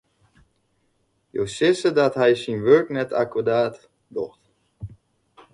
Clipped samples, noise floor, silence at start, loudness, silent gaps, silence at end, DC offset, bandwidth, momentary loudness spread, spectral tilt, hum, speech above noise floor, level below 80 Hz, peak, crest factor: under 0.1%; -68 dBFS; 1.35 s; -21 LUFS; none; 0.65 s; under 0.1%; 11.5 kHz; 20 LU; -5.5 dB/octave; none; 48 dB; -58 dBFS; -4 dBFS; 18 dB